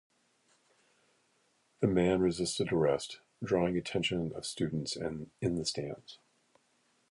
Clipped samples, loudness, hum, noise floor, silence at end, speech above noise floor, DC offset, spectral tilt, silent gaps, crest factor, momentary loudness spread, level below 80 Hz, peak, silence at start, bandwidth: under 0.1%; -33 LUFS; none; -73 dBFS; 0.95 s; 41 dB; under 0.1%; -5 dB/octave; none; 22 dB; 12 LU; -58 dBFS; -14 dBFS; 1.8 s; 11.5 kHz